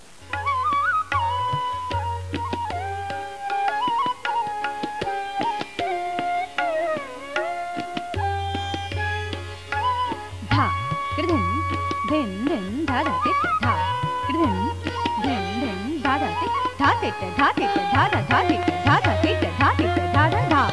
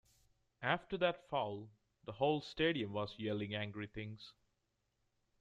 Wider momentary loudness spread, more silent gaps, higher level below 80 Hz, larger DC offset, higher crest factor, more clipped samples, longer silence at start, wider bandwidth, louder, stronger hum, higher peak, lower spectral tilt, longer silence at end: second, 9 LU vs 17 LU; neither; first, -46 dBFS vs -68 dBFS; first, 0.4% vs under 0.1%; second, 16 dB vs 22 dB; neither; second, 0.2 s vs 0.6 s; first, 11 kHz vs 9 kHz; first, -23 LUFS vs -39 LUFS; neither; first, -6 dBFS vs -18 dBFS; about the same, -6 dB/octave vs -6.5 dB/octave; second, 0 s vs 1.1 s